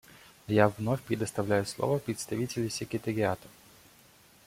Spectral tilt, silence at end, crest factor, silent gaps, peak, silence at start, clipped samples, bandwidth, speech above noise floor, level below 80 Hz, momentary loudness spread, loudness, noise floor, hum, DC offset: -5.5 dB/octave; 0.95 s; 24 dB; none; -6 dBFS; 0.5 s; under 0.1%; 16.5 kHz; 29 dB; -64 dBFS; 8 LU; -31 LUFS; -59 dBFS; none; under 0.1%